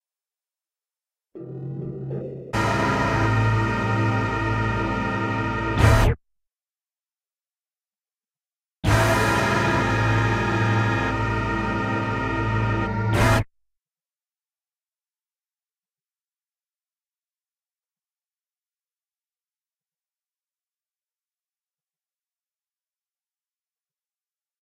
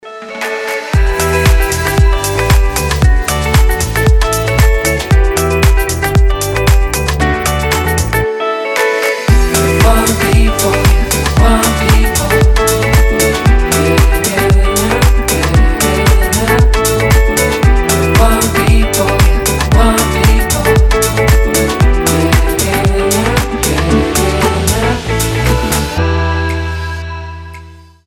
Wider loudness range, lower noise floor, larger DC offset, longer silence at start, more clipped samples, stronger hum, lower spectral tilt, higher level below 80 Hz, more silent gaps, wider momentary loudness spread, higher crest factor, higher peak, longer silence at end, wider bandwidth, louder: first, 6 LU vs 2 LU; first, under -90 dBFS vs -34 dBFS; neither; first, 1.35 s vs 0.05 s; neither; neither; first, -6 dB/octave vs -4.5 dB/octave; second, -36 dBFS vs -14 dBFS; neither; first, 12 LU vs 4 LU; first, 22 dB vs 10 dB; second, -4 dBFS vs 0 dBFS; first, 11.15 s vs 0.3 s; second, 15 kHz vs 17.5 kHz; second, -22 LUFS vs -11 LUFS